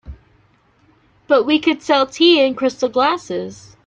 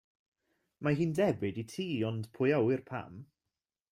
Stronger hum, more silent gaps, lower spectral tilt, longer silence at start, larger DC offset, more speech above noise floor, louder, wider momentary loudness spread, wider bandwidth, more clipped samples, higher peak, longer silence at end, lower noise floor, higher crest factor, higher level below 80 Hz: neither; neither; second, -4 dB/octave vs -7 dB/octave; second, 0.05 s vs 0.8 s; neither; second, 40 dB vs over 58 dB; first, -16 LUFS vs -33 LUFS; about the same, 13 LU vs 13 LU; second, 8.2 kHz vs 15.5 kHz; neither; first, -2 dBFS vs -18 dBFS; second, 0.3 s vs 0.7 s; second, -56 dBFS vs under -90 dBFS; about the same, 16 dB vs 16 dB; first, -48 dBFS vs -68 dBFS